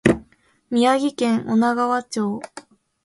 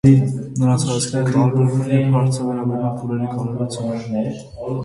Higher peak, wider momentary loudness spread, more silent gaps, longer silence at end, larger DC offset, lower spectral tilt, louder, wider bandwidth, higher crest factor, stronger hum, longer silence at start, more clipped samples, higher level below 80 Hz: about the same, 0 dBFS vs 0 dBFS; about the same, 8 LU vs 8 LU; neither; first, 0.45 s vs 0 s; neither; second, -5.5 dB/octave vs -7 dB/octave; about the same, -21 LUFS vs -19 LUFS; about the same, 11.5 kHz vs 11.5 kHz; about the same, 22 dB vs 18 dB; neither; about the same, 0.05 s vs 0.05 s; neither; about the same, -50 dBFS vs -48 dBFS